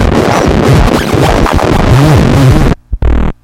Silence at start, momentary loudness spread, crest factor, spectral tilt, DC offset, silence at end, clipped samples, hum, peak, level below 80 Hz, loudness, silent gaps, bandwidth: 0 s; 7 LU; 6 dB; -6.5 dB/octave; under 0.1%; 0.1 s; 1%; none; 0 dBFS; -14 dBFS; -8 LUFS; none; 16.5 kHz